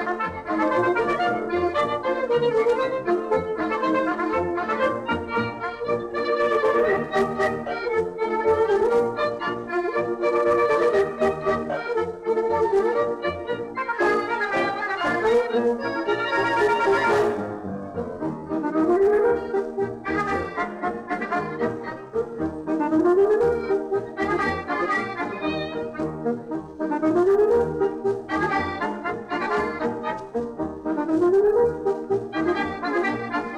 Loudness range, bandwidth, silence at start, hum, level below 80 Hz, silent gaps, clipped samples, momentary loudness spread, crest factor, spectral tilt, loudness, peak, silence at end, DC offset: 3 LU; 11 kHz; 0 s; none; -54 dBFS; none; under 0.1%; 9 LU; 12 dB; -6.5 dB/octave; -23 LUFS; -10 dBFS; 0 s; under 0.1%